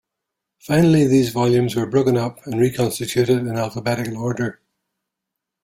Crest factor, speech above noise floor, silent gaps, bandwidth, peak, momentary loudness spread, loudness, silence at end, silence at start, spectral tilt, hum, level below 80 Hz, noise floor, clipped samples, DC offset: 14 dB; 64 dB; none; 16.5 kHz; -4 dBFS; 9 LU; -19 LUFS; 1.1 s; 0.65 s; -6.5 dB/octave; none; -52 dBFS; -82 dBFS; under 0.1%; under 0.1%